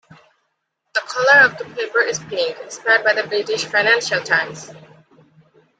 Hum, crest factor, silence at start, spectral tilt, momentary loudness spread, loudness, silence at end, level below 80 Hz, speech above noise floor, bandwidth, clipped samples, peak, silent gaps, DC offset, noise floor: none; 18 dB; 0.95 s; -2 dB/octave; 13 LU; -17 LUFS; 1 s; -68 dBFS; 55 dB; 9.4 kHz; under 0.1%; -2 dBFS; none; under 0.1%; -73 dBFS